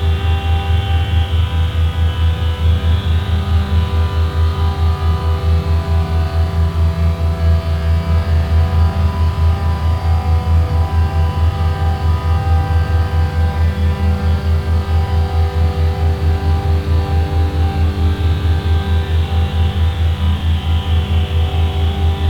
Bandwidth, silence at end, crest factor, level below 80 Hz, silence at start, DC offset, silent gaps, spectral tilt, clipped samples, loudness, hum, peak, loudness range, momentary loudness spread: 6 kHz; 0 s; 12 dB; -22 dBFS; 0 s; under 0.1%; none; -7.5 dB/octave; under 0.1%; -16 LUFS; none; -2 dBFS; 1 LU; 2 LU